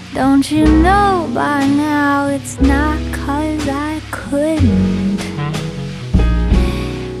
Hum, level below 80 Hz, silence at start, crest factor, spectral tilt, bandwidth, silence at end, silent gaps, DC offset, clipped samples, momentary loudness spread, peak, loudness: none; -22 dBFS; 0 s; 14 dB; -6.5 dB/octave; 13.5 kHz; 0 s; none; under 0.1%; under 0.1%; 10 LU; 0 dBFS; -15 LUFS